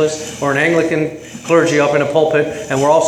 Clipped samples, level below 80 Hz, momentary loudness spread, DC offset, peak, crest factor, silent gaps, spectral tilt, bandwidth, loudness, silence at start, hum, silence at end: under 0.1%; -52 dBFS; 7 LU; under 0.1%; 0 dBFS; 14 dB; none; -5 dB/octave; 14 kHz; -15 LUFS; 0 s; none; 0 s